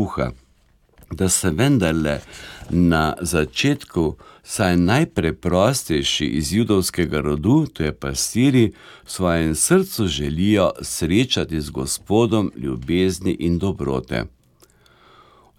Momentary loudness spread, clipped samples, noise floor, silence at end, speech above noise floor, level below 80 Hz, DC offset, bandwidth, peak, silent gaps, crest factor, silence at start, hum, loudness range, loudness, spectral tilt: 8 LU; under 0.1%; -57 dBFS; 1.3 s; 38 dB; -38 dBFS; under 0.1%; 17 kHz; -2 dBFS; none; 18 dB; 0 s; none; 2 LU; -20 LUFS; -5 dB/octave